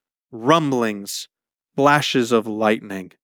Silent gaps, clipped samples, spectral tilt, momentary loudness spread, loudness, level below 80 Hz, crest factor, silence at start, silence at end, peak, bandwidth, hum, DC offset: none; under 0.1%; -4.5 dB/octave; 15 LU; -19 LUFS; -72 dBFS; 20 dB; 0.3 s; 0.15 s; -2 dBFS; 20 kHz; none; under 0.1%